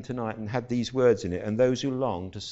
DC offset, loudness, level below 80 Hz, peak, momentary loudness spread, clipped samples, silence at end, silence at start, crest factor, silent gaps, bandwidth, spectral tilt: under 0.1%; -27 LUFS; -56 dBFS; -10 dBFS; 9 LU; under 0.1%; 0 s; 0 s; 16 dB; none; 8 kHz; -6 dB/octave